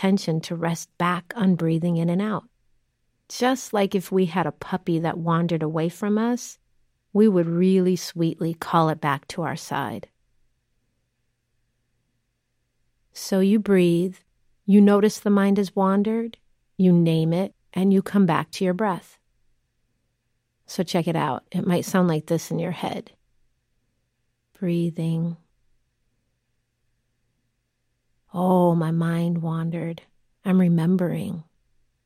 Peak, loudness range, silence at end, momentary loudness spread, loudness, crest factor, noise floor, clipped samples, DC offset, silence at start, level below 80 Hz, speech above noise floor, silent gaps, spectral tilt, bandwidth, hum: -4 dBFS; 10 LU; 0.65 s; 12 LU; -23 LUFS; 18 dB; -73 dBFS; under 0.1%; under 0.1%; 0 s; -66 dBFS; 52 dB; none; -7 dB/octave; 15.5 kHz; none